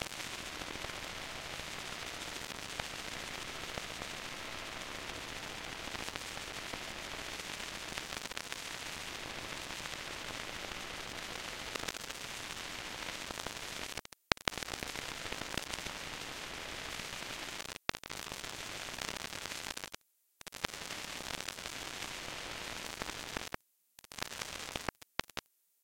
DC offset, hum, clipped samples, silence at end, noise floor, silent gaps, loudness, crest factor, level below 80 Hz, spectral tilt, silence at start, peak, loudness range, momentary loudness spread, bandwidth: under 0.1%; none; under 0.1%; 0.45 s; -63 dBFS; none; -41 LUFS; 42 dB; -60 dBFS; -1.5 dB/octave; 0 s; -2 dBFS; 3 LU; 3 LU; 17 kHz